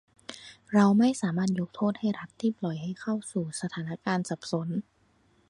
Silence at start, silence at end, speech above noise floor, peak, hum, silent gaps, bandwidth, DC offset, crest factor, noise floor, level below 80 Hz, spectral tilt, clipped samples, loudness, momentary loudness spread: 0.3 s; 0.7 s; 38 dB; -10 dBFS; none; none; 11 kHz; under 0.1%; 20 dB; -66 dBFS; -68 dBFS; -6 dB/octave; under 0.1%; -29 LUFS; 12 LU